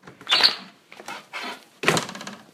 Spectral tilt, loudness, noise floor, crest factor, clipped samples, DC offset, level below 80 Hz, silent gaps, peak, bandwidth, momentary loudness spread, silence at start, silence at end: -2 dB/octave; -21 LUFS; -45 dBFS; 26 dB; under 0.1%; under 0.1%; -68 dBFS; none; -2 dBFS; 16 kHz; 21 LU; 0.05 s; 0.1 s